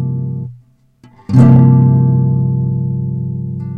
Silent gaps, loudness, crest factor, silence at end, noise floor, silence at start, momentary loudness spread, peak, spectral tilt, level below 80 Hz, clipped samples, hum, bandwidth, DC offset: none; -12 LUFS; 12 dB; 0 s; -47 dBFS; 0 s; 15 LU; 0 dBFS; -11 dB/octave; -42 dBFS; 0.5%; none; 2.8 kHz; under 0.1%